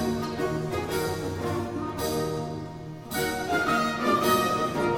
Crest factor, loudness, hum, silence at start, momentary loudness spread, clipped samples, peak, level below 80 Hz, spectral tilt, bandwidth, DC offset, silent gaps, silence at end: 16 dB; -27 LUFS; none; 0 s; 10 LU; under 0.1%; -12 dBFS; -50 dBFS; -5 dB/octave; 17 kHz; under 0.1%; none; 0 s